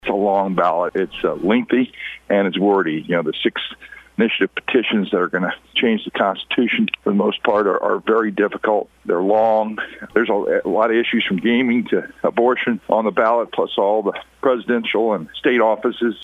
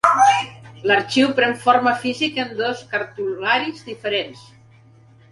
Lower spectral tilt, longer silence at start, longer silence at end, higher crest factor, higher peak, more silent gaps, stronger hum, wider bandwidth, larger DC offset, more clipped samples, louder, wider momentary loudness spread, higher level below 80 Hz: first, -7.5 dB/octave vs -3.5 dB/octave; about the same, 0.05 s vs 0.05 s; second, 0 s vs 0.95 s; about the same, 18 dB vs 20 dB; about the same, 0 dBFS vs 0 dBFS; neither; neither; second, 7.4 kHz vs 11.5 kHz; neither; neither; about the same, -19 LUFS vs -19 LUFS; second, 5 LU vs 11 LU; about the same, -58 dBFS vs -62 dBFS